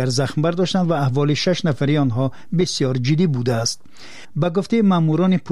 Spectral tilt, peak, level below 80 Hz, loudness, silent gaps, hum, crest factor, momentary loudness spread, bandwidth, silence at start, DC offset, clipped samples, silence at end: -6 dB/octave; -8 dBFS; -54 dBFS; -19 LUFS; none; none; 12 dB; 6 LU; 12.5 kHz; 0 s; 2%; under 0.1%; 0 s